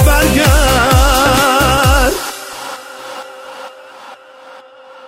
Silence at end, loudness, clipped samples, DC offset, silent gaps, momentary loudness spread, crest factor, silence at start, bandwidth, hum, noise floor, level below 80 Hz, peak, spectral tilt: 0 s; -11 LUFS; under 0.1%; under 0.1%; none; 20 LU; 14 dB; 0 s; 16.5 kHz; none; -37 dBFS; -18 dBFS; 0 dBFS; -4 dB/octave